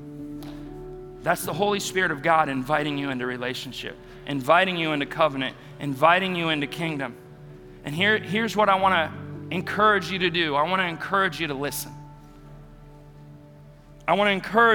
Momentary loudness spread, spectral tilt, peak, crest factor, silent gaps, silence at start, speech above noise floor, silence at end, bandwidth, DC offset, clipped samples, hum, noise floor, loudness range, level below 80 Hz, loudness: 18 LU; -4.5 dB/octave; -4 dBFS; 22 dB; none; 0 s; 24 dB; 0 s; 19.5 kHz; under 0.1%; under 0.1%; none; -48 dBFS; 5 LU; -52 dBFS; -24 LUFS